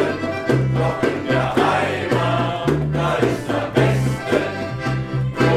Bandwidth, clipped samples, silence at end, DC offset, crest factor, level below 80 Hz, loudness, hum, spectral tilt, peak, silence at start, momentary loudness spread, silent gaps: 13.5 kHz; under 0.1%; 0 s; under 0.1%; 16 dB; -40 dBFS; -20 LUFS; none; -6.5 dB/octave; -2 dBFS; 0 s; 6 LU; none